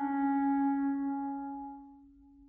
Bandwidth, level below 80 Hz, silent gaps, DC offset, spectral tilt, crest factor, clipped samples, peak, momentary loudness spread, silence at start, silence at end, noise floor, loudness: 2.4 kHz; -68 dBFS; none; under 0.1%; -6 dB/octave; 12 dB; under 0.1%; -22 dBFS; 15 LU; 0 s; 0.4 s; -58 dBFS; -32 LUFS